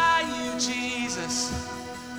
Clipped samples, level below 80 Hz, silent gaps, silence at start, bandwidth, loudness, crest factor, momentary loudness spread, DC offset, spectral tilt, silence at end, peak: under 0.1%; -50 dBFS; none; 0 s; over 20 kHz; -27 LUFS; 18 dB; 10 LU; under 0.1%; -2 dB/octave; 0 s; -10 dBFS